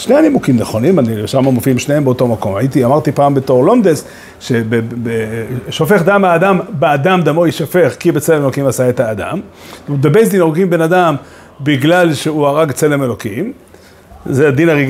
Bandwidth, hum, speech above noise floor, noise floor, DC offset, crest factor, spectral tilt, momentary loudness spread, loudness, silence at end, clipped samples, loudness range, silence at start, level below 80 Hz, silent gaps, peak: 16 kHz; none; 27 dB; -39 dBFS; under 0.1%; 12 dB; -6.5 dB/octave; 11 LU; -12 LUFS; 0 s; under 0.1%; 2 LU; 0 s; -48 dBFS; none; 0 dBFS